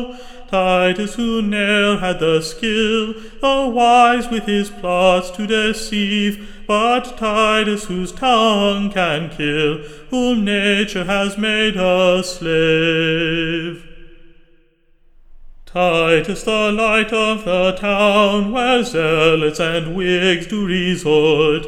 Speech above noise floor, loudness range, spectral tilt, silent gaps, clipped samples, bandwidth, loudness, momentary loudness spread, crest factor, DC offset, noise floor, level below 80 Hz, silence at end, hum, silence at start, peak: 37 dB; 4 LU; -4.5 dB/octave; none; under 0.1%; 15.5 kHz; -16 LUFS; 7 LU; 16 dB; under 0.1%; -53 dBFS; -38 dBFS; 0 s; none; 0 s; 0 dBFS